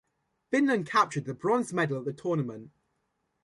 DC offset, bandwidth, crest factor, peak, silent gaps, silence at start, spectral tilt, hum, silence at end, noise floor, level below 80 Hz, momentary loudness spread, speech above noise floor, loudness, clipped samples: under 0.1%; 11.5 kHz; 20 dB; -10 dBFS; none; 0.5 s; -6 dB/octave; none; 0.75 s; -78 dBFS; -72 dBFS; 7 LU; 50 dB; -29 LUFS; under 0.1%